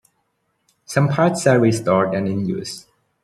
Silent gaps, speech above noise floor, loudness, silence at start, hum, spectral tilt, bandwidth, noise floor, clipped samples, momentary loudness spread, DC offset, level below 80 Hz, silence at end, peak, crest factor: none; 52 dB; -18 LUFS; 0.9 s; none; -6 dB/octave; 13.5 kHz; -69 dBFS; under 0.1%; 12 LU; under 0.1%; -58 dBFS; 0.45 s; -2 dBFS; 18 dB